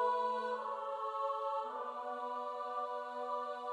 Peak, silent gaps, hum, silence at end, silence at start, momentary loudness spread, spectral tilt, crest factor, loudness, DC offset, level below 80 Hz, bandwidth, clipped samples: -24 dBFS; none; none; 0 s; 0 s; 5 LU; -3 dB/octave; 16 dB; -39 LUFS; under 0.1%; under -90 dBFS; 11 kHz; under 0.1%